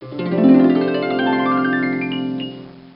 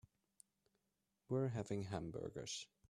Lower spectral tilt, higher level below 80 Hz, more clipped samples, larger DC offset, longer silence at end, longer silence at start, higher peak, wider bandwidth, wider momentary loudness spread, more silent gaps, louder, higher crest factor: first, -11.5 dB/octave vs -5.5 dB/octave; first, -58 dBFS vs -72 dBFS; neither; neither; second, 0.1 s vs 0.25 s; second, 0 s vs 1.3 s; first, -2 dBFS vs -28 dBFS; second, 5.4 kHz vs 12.5 kHz; first, 14 LU vs 7 LU; neither; first, -17 LUFS vs -45 LUFS; about the same, 16 dB vs 18 dB